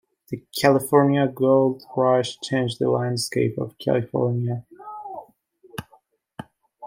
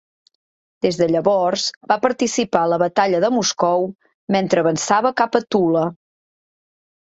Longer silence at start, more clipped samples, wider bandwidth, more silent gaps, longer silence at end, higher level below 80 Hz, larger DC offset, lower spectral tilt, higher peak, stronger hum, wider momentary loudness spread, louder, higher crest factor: second, 0.3 s vs 0.85 s; neither; first, 16.5 kHz vs 8.2 kHz; second, none vs 1.77-1.81 s, 4.14-4.27 s; second, 0 s vs 1.1 s; about the same, -64 dBFS vs -60 dBFS; neither; first, -6 dB/octave vs -4 dB/octave; about the same, -2 dBFS vs 0 dBFS; neither; first, 20 LU vs 5 LU; second, -22 LUFS vs -18 LUFS; about the same, 20 dB vs 18 dB